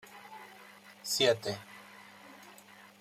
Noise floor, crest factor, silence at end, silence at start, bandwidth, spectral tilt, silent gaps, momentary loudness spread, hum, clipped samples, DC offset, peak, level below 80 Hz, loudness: -56 dBFS; 24 dB; 0.5 s; 0.1 s; 16 kHz; -2.5 dB/octave; none; 25 LU; none; under 0.1%; under 0.1%; -14 dBFS; -80 dBFS; -31 LUFS